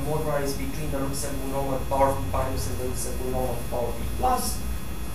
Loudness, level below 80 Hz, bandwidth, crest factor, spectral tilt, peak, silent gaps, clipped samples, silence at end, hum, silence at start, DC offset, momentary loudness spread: -28 LUFS; -34 dBFS; 15.5 kHz; 20 dB; -5 dB/octave; -8 dBFS; none; under 0.1%; 0 s; none; 0 s; 3%; 7 LU